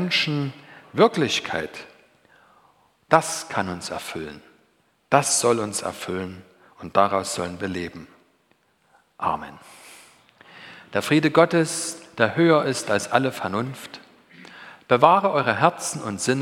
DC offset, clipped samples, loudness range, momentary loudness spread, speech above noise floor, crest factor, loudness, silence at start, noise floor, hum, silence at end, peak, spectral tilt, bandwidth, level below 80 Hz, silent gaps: under 0.1%; under 0.1%; 7 LU; 20 LU; 42 dB; 24 dB; -22 LUFS; 0 s; -64 dBFS; none; 0 s; 0 dBFS; -4 dB/octave; 17 kHz; -62 dBFS; none